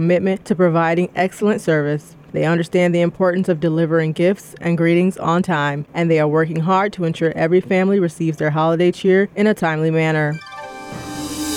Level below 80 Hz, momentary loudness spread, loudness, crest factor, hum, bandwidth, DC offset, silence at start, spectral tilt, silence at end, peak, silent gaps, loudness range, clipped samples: -56 dBFS; 8 LU; -18 LUFS; 14 dB; none; 15 kHz; under 0.1%; 0 s; -7 dB/octave; 0 s; -4 dBFS; none; 1 LU; under 0.1%